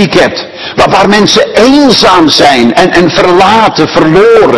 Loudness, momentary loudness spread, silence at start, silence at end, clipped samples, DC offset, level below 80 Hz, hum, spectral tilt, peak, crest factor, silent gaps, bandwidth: -4 LUFS; 4 LU; 0 s; 0 s; 20%; under 0.1%; -34 dBFS; none; -4.5 dB/octave; 0 dBFS; 4 dB; none; 12 kHz